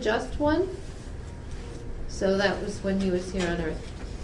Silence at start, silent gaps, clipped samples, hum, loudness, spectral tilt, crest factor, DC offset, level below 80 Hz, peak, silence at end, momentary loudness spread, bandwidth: 0 s; none; under 0.1%; none; -28 LUFS; -5.5 dB/octave; 18 dB; under 0.1%; -38 dBFS; -10 dBFS; 0 s; 15 LU; 11.5 kHz